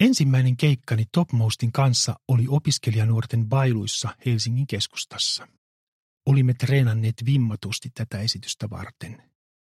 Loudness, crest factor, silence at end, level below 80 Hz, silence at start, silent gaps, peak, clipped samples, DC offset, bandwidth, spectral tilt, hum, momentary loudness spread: -23 LUFS; 18 dB; 0.5 s; -58 dBFS; 0 s; 5.58-6.17 s; -6 dBFS; under 0.1%; under 0.1%; 13.5 kHz; -5 dB/octave; none; 10 LU